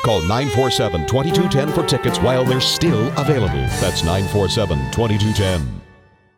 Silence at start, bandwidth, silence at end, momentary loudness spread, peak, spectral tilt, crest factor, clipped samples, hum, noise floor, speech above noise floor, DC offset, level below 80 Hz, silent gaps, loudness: 0 s; 17.5 kHz; 0.55 s; 4 LU; -4 dBFS; -5 dB/octave; 14 dB; under 0.1%; none; -49 dBFS; 32 dB; under 0.1%; -34 dBFS; none; -18 LUFS